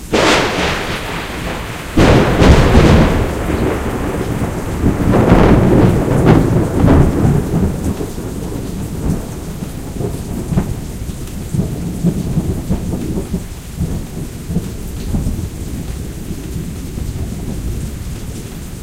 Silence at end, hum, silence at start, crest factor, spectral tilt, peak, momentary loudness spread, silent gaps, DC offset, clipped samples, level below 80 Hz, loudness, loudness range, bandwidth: 0 s; none; 0 s; 14 dB; -6.5 dB/octave; 0 dBFS; 16 LU; none; under 0.1%; 0.2%; -22 dBFS; -16 LUFS; 11 LU; 16.5 kHz